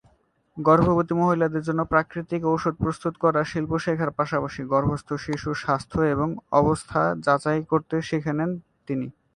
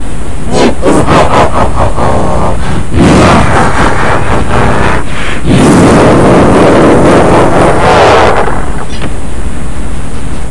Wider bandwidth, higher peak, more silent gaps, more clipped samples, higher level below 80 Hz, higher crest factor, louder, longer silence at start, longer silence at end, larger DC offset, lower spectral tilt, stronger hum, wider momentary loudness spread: about the same, 11 kHz vs 12 kHz; second, -4 dBFS vs 0 dBFS; neither; second, under 0.1% vs 3%; second, -48 dBFS vs -18 dBFS; first, 20 dB vs 8 dB; second, -24 LUFS vs -6 LUFS; first, 0.55 s vs 0 s; first, 0.25 s vs 0 s; second, under 0.1% vs 40%; first, -7.5 dB/octave vs -6 dB/octave; neither; second, 8 LU vs 15 LU